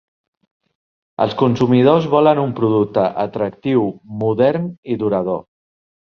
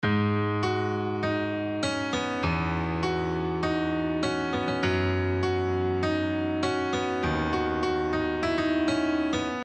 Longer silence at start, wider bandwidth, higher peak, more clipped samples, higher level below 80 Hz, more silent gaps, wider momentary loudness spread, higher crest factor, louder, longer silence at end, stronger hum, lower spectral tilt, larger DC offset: first, 1.2 s vs 0 s; second, 6.6 kHz vs 9.2 kHz; first, -2 dBFS vs -14 dBFS; neither; second, -56 dBFS vs -46 dBFS; first, 4.78-4.83 s vs none; first, 11 LU vs 3 LU; about the same, 16 dB vs 12 dB; first, -17 LUFS vs -27 LUFS; first, 0.6 s vs 0 s; neither; first, -8.5 dB/octave vs -6 dB/octave; neither